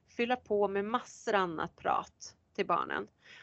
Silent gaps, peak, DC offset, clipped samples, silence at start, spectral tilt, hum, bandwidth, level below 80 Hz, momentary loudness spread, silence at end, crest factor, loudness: none; -14 dBFS; under 0.1%; under 0.1%; 0.2 s; -4.5 dB/octave; none; 8.2 kHz; -70 dBFS; 12 LU; 0 s; 20 dB; -33 LUFS